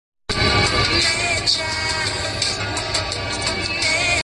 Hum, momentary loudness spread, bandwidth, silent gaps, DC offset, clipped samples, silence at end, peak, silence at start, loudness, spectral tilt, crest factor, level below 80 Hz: none; 6 LU; 11.5 kHz; none; under 0.1%; under 0.1%; 0 s; -4 dBFS; 0.3 s; -19 LUFS; -2.5 dB/octave; 16 dB; -34 dBFS